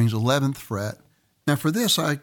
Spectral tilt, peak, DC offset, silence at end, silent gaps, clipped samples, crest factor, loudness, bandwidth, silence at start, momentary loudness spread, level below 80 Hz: -4.5 dB/octave; -6 dBFS; under 0.1%; 0.05 s; none; under 0.1%; 16 dB; -24 LUFS; 19 kHz; 0 s; 10 LU; -62 dBFS